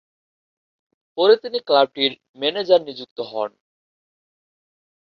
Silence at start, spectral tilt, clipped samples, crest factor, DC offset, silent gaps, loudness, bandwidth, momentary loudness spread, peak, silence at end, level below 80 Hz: 1.15 s; -5.5 dB/octave; under 0.1%; 20 dB; under 0.1%; 2.29-2.34 s, 3.11-3.16 s; -20 LUFS; 6.2 kHz; 14 LU; -2 dBFS; 1.65 s; -72 dBFS